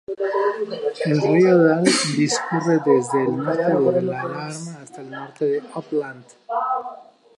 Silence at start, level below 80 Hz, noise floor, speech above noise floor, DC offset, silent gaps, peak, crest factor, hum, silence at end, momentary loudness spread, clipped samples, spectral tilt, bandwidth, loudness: 0.1 s; -70 dBFS; -40 dBFS; 21 dB; under 0.1%; none; -2 dBFS; 18 dB; none; 0.35 s; 18 LU; under 0.1%; -5 dB/octave; 11.5 kHz; -20 LUFS